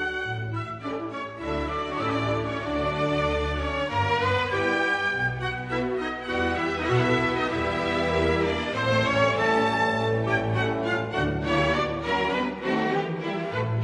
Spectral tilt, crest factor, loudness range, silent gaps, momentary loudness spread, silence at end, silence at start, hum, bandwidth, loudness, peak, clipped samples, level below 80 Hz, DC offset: -6 dB/octave; 16 dB; 3 LU; none; 7 LU; 0 s; 0 s; none; 10.5 kHz; -25 LUFS; -10 dBFS; under 0.1%; -42 dBFS; under 0.1%